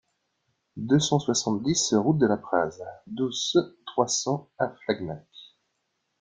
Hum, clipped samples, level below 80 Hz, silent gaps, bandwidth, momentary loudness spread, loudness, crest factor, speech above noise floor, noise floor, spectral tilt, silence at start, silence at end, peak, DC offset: none; under 0.1%; -62 dBFS; none; 9.8 kHz; 15 LU; -26 LUFS; 20 dB; 52 dB; -77 dBFS; -4.5 dB/octave; 0.75 s; 0.75 s; -8 dBFS; under 0.1%